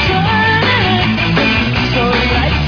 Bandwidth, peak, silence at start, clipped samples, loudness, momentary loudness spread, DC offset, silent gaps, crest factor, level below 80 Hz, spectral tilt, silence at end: 5.4 kHz; 0 dBFS; 0 s; under 0.1%; -12 LUFS; 2 LU; under 0.1%; none; 12 dB; -24 dBFS; -6 dB/octave; 0 s